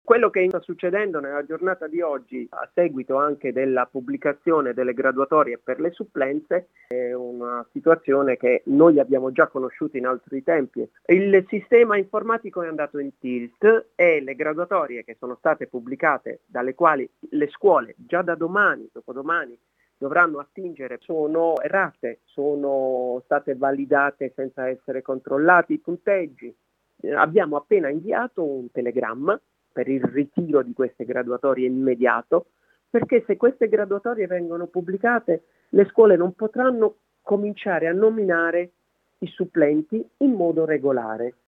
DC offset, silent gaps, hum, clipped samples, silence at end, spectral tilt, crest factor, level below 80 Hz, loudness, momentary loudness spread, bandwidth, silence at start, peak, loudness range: under 0.1%; none; none; under 0.1%; 0.2 s; -9 dB/octave; 22 dB; -74 dBFS; -22 LUFS; 11 LU; 3.9 kHz; 0.05 s; 0 dBFS; 4 LU